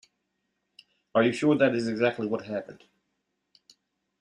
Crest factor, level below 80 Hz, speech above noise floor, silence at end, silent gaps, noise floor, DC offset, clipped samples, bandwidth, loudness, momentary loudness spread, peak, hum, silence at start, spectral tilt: 20 dB; -72 dBFS; 54 dB; 1.5 s; none; -79 dBFS; under 0.1%; under 0.1%; 10.5 kHz; -26 LUFS; 13 LU; -10 dBFS; none; 1.15 s; -6 dB/octave